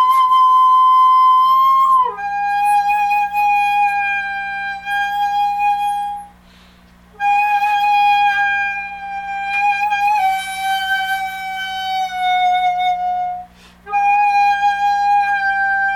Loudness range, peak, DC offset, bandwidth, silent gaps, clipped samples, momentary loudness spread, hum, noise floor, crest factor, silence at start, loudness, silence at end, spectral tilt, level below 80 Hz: 6 LU; -6 dBFS; under 0.1%; 17.5 kHz; none; under 0.1%; 12 LU; 60 Hz at -50 dBFS; -46 dBFS; 10 dB; 0 s; -15 LUFS; 0 s; -1 dB/octave; -52 dBFS